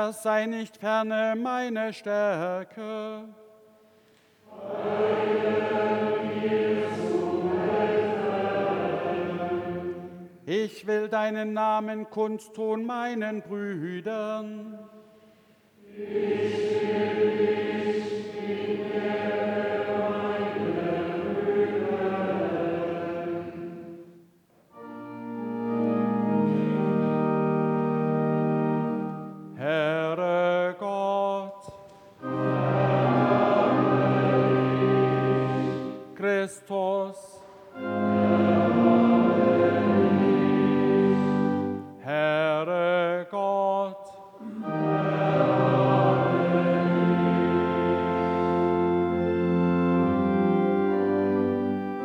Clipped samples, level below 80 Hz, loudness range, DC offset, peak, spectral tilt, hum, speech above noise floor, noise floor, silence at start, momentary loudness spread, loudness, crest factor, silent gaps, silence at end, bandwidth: under 0.1%; -64 dBFS; 8 LU; under 0.1%; -8 dBFS; -8 dB/octave; none; 32 dB; -60 dBFS; 0 s; 12 LU; -25 LUFS; 18 dB; none; 0 s; 12 kHz